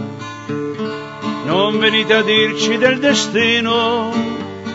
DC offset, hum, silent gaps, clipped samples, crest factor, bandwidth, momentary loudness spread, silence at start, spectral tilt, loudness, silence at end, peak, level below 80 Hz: under 0.1%; none; none; under 0.1%; 16 dB; 8 kHz; 12 LU; 0 s; -3.5 dB/octave; -15 LUFS; 0 s; 0 dBFS; -58 dBFS